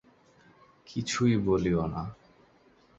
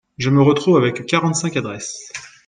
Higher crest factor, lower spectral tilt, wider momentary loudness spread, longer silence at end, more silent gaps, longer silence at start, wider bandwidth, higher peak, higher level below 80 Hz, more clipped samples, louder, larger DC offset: about the same, 18 dB vs 16 dB; about the same, -6 dB/octave vs -5.5 dB/octave; about the same, 13 LU vs 14 LU; first, 0.85 s vs 0.2 s; neither; first, 0.9 s vs 0.2 s; second, 8.2 kHz vs 9.8 kHz; second, -14 dBFS vs -2 dBFS; about the same, -52 dBFS vs -54 dBFS; neither; second, -29 LUFS vs -17 LUFS; neither